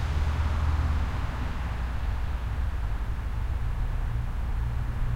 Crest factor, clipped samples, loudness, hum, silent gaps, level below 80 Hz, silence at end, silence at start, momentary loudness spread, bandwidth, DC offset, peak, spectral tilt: 12 dB; under 0.1%; -31 LUFS; none; none; -28 dBFS; 0 s; 0 s; 5 LU; 11 kHz; under 0.1%; -16 dBFS; -7 dB/octave